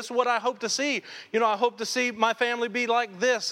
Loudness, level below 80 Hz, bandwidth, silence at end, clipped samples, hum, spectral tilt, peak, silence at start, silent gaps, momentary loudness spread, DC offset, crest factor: -26 LUFS; -80 dBFS; 16 kHz; 0 s; under 0.1%; none; -2 dB/octave; -8 dBFS; 0 s; none; 3 LU; under 0.1%; 18 dB